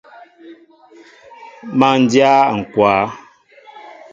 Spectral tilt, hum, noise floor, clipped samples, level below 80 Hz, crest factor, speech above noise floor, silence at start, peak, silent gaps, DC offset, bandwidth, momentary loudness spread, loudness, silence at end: -5.5 dB/octave; none; -45 dBFS; under 0.1%; -56 dBFS; 18 dB; 32 dB; 0.45 s; 0 dBFS; none; under 0.1%; 7.8 kHz; 15 LU; -14 LUFS; 0.25 s